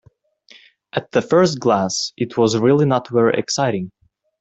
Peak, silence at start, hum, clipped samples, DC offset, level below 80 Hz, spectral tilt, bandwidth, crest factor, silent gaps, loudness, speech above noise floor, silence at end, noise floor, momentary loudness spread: -2 dBFS; 0.95 s; none; under 0.1%; under 0.1%; -58 dBFS; -5 dB/octave; 8.4 kHz; 16 dB; none; -18 LUFS; 35 dB; 0.55 s; -52 dBFS; 11 LU